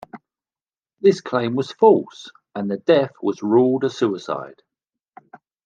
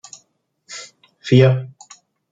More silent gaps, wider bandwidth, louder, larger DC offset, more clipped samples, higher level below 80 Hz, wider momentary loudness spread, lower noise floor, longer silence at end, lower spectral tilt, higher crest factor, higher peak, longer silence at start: neither; about the same, 7.6 kHz vs 7.8 kHz; second, -19 LUFS vs -15 LUFS; neither; neither; second, -72 dBFS vs -56 dBFS; second, 15 LU vs 22 LU; first, under -90 dBFS vs -64 dBFS; first, 1.15 s vs 0.65 s; about the same, -6.5 dB/octave vs -7 dB/octave; about the same, 18 dB vs 18 dB; about the same, -2 dBFS vs -2 dBFS; second, 0.15 s vs 0.7 s